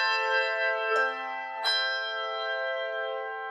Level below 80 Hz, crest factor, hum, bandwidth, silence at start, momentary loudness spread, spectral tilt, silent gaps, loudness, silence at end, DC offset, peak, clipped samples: under -90 dBFS; 16 dB; none; 13 kHz; 0 s; 8 LU; 1.5 dB/octave; none; -28 LUFS; 0 s; under 0.1%; -14 dBFS; under 0.1%